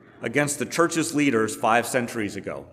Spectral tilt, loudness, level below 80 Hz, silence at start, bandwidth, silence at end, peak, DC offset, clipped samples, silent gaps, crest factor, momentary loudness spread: -4 dB/octave; -23 LUFS; -66 dBFS; 0.2 s; 16 kHz; 0 s; -6 dBFS; under 0.1%; under 0.1%; none; 18 dB; 8 LU